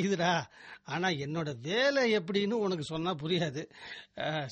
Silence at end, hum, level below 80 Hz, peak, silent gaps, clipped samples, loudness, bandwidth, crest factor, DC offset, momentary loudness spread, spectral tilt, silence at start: 0 s; none; -68 dBFS; -16 dBFS; none; under 0.1%; -31 LUFS; 8.4 kHz; 16 dB; under 0.1%; 16 LU; -5 dB/octave; 0 s